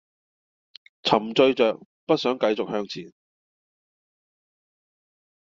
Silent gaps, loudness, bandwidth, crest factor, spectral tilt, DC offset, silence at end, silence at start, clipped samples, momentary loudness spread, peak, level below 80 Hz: 1.85-2.07 s; -23 LUFS; 7.6 kHz; 24 dB; -3 dB/octave; under 0.1%; 2.5 s; 1.05 s; under 0.1%; 15 LU; -2 dBFS; -68 dBFS